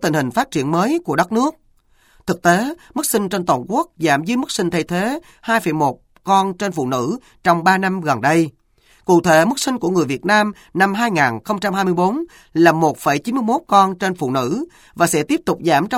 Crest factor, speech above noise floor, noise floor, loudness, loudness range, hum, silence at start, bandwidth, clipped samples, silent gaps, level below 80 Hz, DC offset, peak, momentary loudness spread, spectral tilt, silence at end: 18 dB; 38 dB; -55 dBFS; -18 LUFS; 3 LU; none; 0 s; 16.5 kHz; under 0.1%; none; -54 dBFS; under 0.1%; 0 dBFS; 8 LU; -5 dB/octave; 0 s